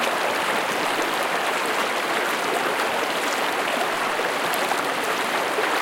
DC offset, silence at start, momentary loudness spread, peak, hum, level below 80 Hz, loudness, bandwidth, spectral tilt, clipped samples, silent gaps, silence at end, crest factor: under 0.1%; 0 s; 1 LU; -6 dBFS; none; -66 dBFS; -23 LUFS; 17 kHz; -1.5 dB/octave; under 0.1%; none; 0 s; 16 dB